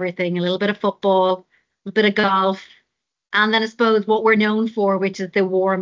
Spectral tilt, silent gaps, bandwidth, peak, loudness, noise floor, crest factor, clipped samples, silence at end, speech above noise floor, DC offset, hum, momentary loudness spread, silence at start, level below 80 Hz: -6 dB/octave; none; 7.6 kHz; -4 dBFS; -19 LUFS; -78 dBFS; 16 dB; under 0.1%; 0 s; 60 dB; under 0.1%; none; 6 LU; 0 s; -68 dBFS